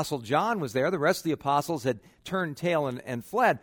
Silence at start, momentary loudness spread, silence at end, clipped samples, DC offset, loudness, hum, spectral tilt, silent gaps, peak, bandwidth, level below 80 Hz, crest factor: 0 s; 7 LU; 0.05 s; under 0.1%; under 0.1%; -28 LUFS; none; -5.5 dB/octave; none; -10 dBFS; over 20 kHz; -64 dBFS; 18 dB